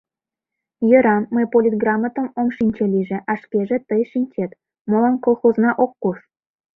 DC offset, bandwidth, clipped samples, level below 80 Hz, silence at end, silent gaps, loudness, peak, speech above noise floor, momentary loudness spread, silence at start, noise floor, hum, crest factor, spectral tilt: under 0.1%; 3.9 kHz; under 0.1%; -60 dBFS; 0.6 s; 4.81-4.85 s; -19 LUFS; -2 dBFS; 69 dB; 10 LU; 0.8 s; -87 dBFS; none; 18 dB; -11 dB/octave